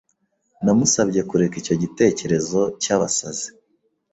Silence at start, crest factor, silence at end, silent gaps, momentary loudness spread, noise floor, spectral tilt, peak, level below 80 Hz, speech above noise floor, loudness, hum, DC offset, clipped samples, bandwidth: 0.6 s; 18 dB; 0.65 s; none; 7 LU; -69 dBFS; -4.5 dB/octave; -2 dBFS; -54 dBFS; 49 dB; -20 LUFS; none; under 0.1%; under 0.1%; 8.2 kHz